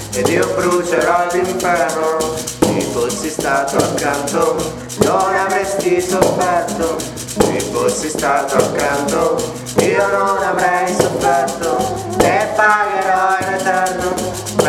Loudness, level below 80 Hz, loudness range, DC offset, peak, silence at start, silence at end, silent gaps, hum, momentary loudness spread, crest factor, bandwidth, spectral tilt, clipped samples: -16 LUFS; -42 dBFS; 2 LU; under 0.1%; 0 dBFS; 0 s; 0 s; none; none; 5 LU; 16 dB; 18.5 kHz; -4 dB/octave; under 0.1%